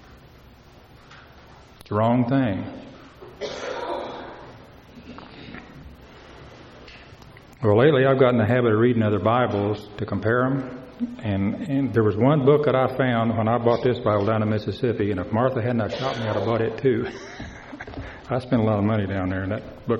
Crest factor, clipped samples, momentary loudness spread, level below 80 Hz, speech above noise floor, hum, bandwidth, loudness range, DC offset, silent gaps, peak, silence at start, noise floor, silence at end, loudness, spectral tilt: 20 dB; under 0.1%; 20 LU; -52 dBFS; 27 dB; none; 7.2 kHz; 15 LU; under 0.1%; none; -4 dBFS; 0.1 s; -49 dBFS; 0 s; -22 LUFS; -8.5 dB/octave